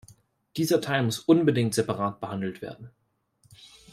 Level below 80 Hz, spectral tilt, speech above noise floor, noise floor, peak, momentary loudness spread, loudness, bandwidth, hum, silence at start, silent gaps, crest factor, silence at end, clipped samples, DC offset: -66 dBFS; -5.5 dB/octave; 41 dB; -66 dBFS; -8 dBFS; 18 LU; -26 LUFS; 16 kHz; none; 0.55 s; none; 20 dB; 1.05 s; under 0.1%; under 0.1%